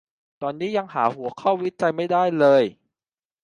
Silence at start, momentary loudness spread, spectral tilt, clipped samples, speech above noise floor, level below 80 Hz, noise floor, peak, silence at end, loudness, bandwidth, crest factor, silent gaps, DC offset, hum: 0.4 s; 11 LU; -7 dB/octave; under 0.1%; over 69 dB; -72 dBFS; under -90 dBFS; -4 dBFS; 0.7 s; -22 LUFS; 9.8 kHz; 18 dB; none; under 0.1%; none